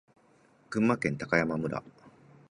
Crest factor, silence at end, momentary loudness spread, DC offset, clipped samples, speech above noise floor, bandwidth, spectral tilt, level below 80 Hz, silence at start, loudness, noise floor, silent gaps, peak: 22 dB; 0.4 s; 9 LU; under 0.1%; under 0.1%; 34 dB; 11 kHz; -7 dB/octave; -62 dBFS; 0.7 s; -30 LUFS; -63 dBFS; none; -10 dBFS